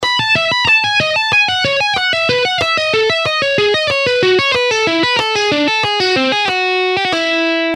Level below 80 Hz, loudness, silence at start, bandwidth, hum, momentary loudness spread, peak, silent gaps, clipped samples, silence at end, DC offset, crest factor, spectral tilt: -50 dBFS; -12 LUFS; 0 s; 13 kHz; none; 3 LU; -2 dBFS; none; under 0.1%; 0 s; under 0.1%; 12 dB; -3 dB/octave